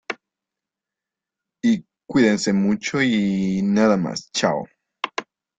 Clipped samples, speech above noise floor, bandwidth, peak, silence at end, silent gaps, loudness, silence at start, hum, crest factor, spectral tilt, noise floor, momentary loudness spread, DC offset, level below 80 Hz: under 0.1%; 68 dB; 9 kHz; -4 dBFS; 0.35 s; none; -21 LUFS; 0.1 s; none; 18 dB; -5 dB/octave; -87 dBFS; 13 LU; under 0.1%; -58 dBFS